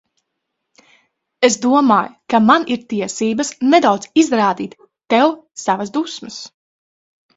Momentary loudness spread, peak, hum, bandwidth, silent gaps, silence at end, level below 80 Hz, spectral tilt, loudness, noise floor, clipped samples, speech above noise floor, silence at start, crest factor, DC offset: 13 LU; 0 dBFS; none; 8 kHz; none; 0.9 s; -62 dBFS; -4 dB/octave; -16 LUFS; -76 dBFS; under 0.1%; 60 dB; 1.4 s; 18 dB; under 0.1%